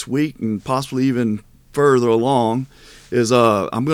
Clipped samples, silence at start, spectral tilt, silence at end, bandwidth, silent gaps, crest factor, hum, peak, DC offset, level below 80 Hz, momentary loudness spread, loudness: under 0.1%; 0 s; -6 dB/octave; 0 s; 16.5 kHz; none; 16 dB; none; -2 dBFS; under 0.1%; -52 dBFS; 11 LU; -18 LUFS